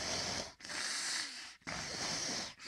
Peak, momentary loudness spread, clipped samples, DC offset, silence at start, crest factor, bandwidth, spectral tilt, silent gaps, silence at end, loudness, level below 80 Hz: -24 dBFS; 7 LU; under 0.1%; under 0.1%; 0 s; 18 dB; 16 kHz; -1 dB/octave; none; 0 s; -38 LUFS; -66 dBFS